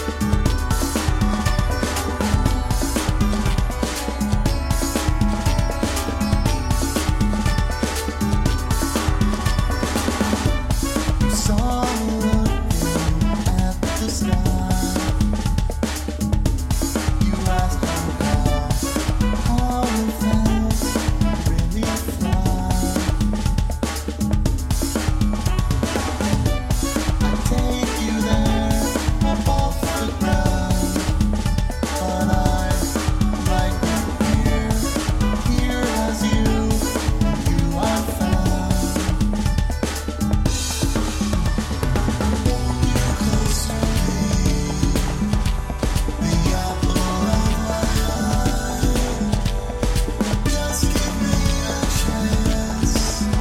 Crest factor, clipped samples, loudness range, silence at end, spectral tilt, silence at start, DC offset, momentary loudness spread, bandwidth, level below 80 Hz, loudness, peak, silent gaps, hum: 16 dB; under 0.1%; 1 LU; 0 s; -5 dB/octave; 0 s; under 0.1%; 3 LU; 16.5 kHz; -22 dBFS; -21 LUFS; -2 dBFS; none; none